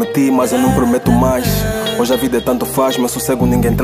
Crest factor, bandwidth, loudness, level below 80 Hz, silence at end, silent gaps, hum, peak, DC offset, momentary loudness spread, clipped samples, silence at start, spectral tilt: 12 dB; 16 kHz; -14 LUFS; -28 dBFS; 0 s; none; none; 0 dBFS; under 0.1%; 4 LU; under 0.1%; 0 s; -5.5 dB/octave